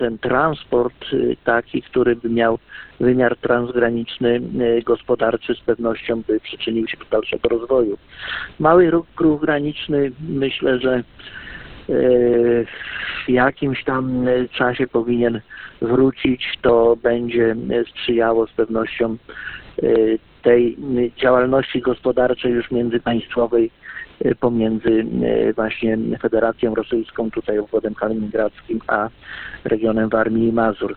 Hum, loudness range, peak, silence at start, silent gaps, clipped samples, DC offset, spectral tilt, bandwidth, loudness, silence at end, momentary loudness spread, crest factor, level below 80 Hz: none; 3 LU; 0 dBFS; 0 s; none; under 0.1%; under 0.1%; -11 dB/octave; 4.4 kHz; -19 LUFS; 0 s; 8 LU; 18 dB; -46 dBFS